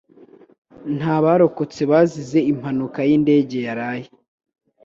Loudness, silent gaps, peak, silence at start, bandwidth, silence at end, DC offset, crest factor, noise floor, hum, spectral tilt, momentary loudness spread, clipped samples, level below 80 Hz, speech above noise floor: -19 LUFS; none; -2 dBFS; 0.8 s; 7.6 kHz; 0.8 s; under 0.1%; 18 dB; -48 dBFS; none; -8 dB/octave; 12 LU; under 0.1%; -60 dBFS; 30 dB